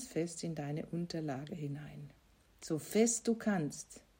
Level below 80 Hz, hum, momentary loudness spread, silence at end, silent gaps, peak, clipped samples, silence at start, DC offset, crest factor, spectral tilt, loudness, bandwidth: -70 dBFS; none; 18 LU; 0.2 s; none; -18 dBFS; under 0.1%; 0 s; under 0.1%; 20 dB; -5 dB/octave; -37 LUFS; 16 kHz